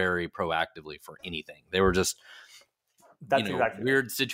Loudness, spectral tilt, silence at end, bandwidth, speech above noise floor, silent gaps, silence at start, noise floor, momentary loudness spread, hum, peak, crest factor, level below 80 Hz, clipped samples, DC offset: -28 LUFS; -4 dB/octave; 0 s; 16 kHz; 34 dB; none; 0 s; -63 dBFS; 18 LU; none; -10 dBFS; 20 dB; -52 dBFS; under 0.1%; under 0.1%